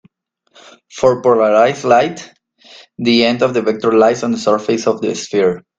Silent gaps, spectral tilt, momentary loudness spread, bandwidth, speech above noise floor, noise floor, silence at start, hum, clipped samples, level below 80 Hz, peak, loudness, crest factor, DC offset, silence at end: none; -5 dB/octave; 8 LU; 9 kHz; 46 dB; -60 dBFS; 0.95 s; none; under 0.1%; -56 dBFS; 0 dBFS; -14 LUFS; 14 dB; under 0.1%; 0.2 s